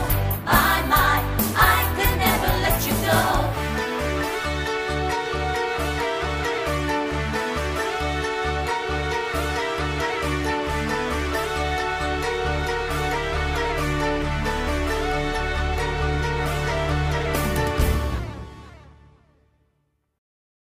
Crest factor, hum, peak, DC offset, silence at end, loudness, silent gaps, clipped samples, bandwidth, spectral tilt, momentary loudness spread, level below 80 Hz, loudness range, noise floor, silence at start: 22 dB; none; -2 dBFS; under 0.1%; 1.75 s; -23 LUFS; none; under 0.1%; 15.5 kHz; -4.5 dB/octave; 6 LU; -30 dBFS; 5 LU; -70 dBFS; 0 s